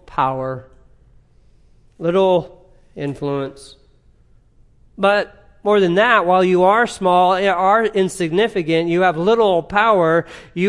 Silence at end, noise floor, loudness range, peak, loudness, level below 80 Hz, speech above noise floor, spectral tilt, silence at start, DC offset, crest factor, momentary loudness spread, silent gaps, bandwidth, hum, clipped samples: 0 s; -52 dBFS; 8 LU; 0 dBFS; -16 LUFS; -50 dBFS; 36 dB; -6 dB/octave; 0.1 s; under 0.1%; 16 dB; 13 LU; none; 12 kHz; none; under 0.1%